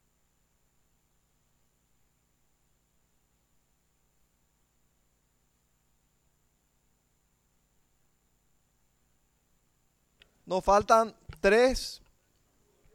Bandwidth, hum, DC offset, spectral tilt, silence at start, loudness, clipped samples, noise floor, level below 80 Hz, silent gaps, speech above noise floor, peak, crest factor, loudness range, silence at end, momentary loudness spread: 16 kHz; 60 Hz at -80 dBFS; under 0.1%; -4 dB/octave; 10.45 s; -26 LUFS; under 0.1%; -72 dBFS; -54 dBFS; none; 48 dB; -8 dBFS; 26 dB; 6 LU; 1 s; 13 LU